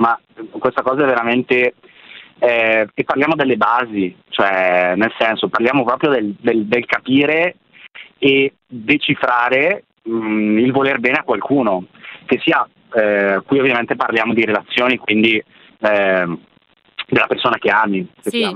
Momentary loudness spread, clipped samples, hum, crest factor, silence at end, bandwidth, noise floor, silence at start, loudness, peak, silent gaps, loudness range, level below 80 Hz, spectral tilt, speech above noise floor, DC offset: 7 LU; under 0.1%; none; 16 dB; 0 s; 12.5 kHz; -41 dBFS; 0 s; -16 LUFS; 0 dBFS; none; 1 LU; -60 dBFS; -6.5 dB/octave; 25 dB; under 0.1%